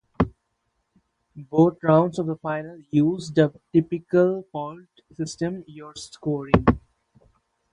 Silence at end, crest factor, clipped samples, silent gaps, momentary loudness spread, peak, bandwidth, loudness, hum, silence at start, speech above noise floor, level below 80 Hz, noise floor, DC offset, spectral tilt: 0.95 s; 24 dB; under 0.1%; none; 14 LU; 0 dBFS; 11 kHz; -23 LUFS; none; 0.2 s; 52 dB; -44 dBFS; -74 dBFS; under 0.1%; -7.5 dB/octave